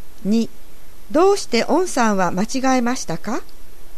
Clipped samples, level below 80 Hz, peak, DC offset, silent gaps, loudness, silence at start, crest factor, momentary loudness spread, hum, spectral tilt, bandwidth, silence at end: under 0.1%; -42 dBFS; -4 dBFS; 7%; none; -19 LUFS; 0.05 s; 16 dB; 10 LU; none; -4.5 dB/octave; 14 kHz; 0 s